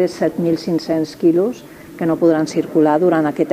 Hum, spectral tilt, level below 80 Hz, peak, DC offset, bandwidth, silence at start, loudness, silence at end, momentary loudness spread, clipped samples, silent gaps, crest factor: none; -7 dB/octave; -58 dBFS; -2 dBFS; under 0.1%; 15 kHz; 0 s; -17 LUFS; 0 s; 8 LU; under 0.1%; none; 14 dB